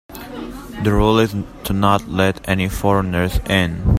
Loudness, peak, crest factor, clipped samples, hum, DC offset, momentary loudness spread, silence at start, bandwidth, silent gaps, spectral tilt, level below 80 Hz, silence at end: -18 LUFS; 0 dBFS; 18 dB; under 0.1%; none; under 0.1%; 16 LU; 0.1 s; 16 kHz; none; -6 dB/octave; -28 dBFS; 0 s